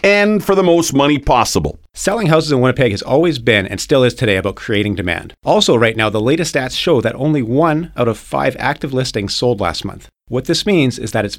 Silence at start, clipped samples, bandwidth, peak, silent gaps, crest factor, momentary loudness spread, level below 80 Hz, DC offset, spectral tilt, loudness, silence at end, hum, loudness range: 0.05 s; under 0.1%; 16.5 kHz; 0 dBFS; none; 14 dB; 7 LU; -38 dBFS; under 0.1%; -5 dB/octave; -15 LUFS; 0 s; none; 3 LU